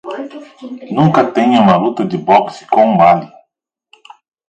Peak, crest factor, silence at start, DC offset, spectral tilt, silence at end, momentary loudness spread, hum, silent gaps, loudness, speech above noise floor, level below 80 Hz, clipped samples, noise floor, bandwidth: 0 dBFS; 14 dB; 0.05 s; under 0.1%; -7.5 dB/octave; 1.25 s; 20 LU; none; none; -12 LUFS; 57 dB; -54 dBFS; under 0.1%; -69 dBFS; 8.8 kHz